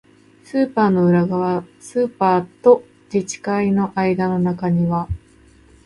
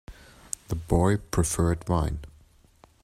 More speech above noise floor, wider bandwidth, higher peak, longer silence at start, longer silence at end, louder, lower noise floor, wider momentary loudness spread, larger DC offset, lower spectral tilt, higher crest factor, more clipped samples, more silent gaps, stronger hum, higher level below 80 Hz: about the same, 32 dB vs 33 dB; second, 11.5 kHz vs 15.5 kHz; first, -2 dBFS vs -6 dBFS; first, 0.55 s vs 0.1 s; about the same, 0.7 s vs 0.8 s; first, -19 LUFS vs -27 LUFS; second, -50 dBFS vs -58 dBFS; second, 10 LU vs 14 LU; neither; first, -7.5 dB/octave vs -6 dB/octave; about the same, 18 dB vs 22 dB; neither; neither; neither; second, -44 dBFS vs -38 dBFS